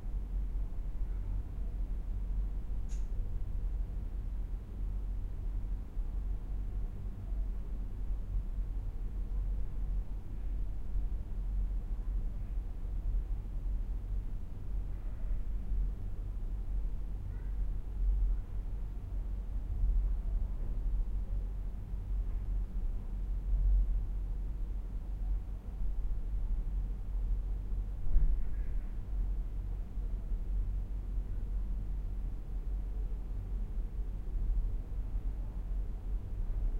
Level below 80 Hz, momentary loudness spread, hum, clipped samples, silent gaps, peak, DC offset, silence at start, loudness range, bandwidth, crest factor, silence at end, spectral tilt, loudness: -34 dBFS; 5 LU; none; under 0.1%; none; -14 dBFS; under 0.1%; 0 s; 3 LU; 2.6 kHz; 20 dB; 0 s; -8.5 dB/octave; -40 LUFS